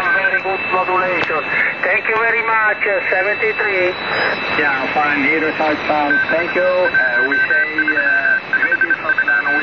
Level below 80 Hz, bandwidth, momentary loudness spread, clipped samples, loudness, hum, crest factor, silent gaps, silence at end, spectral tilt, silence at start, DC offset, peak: -54 dBFS; 6.8 kHz; 3 LU; under 0.1%; -15 LUFS; none; 14 dB; none; 0 s; -5.5 dB/octave; 0 s; 0.2%; -2 dBFS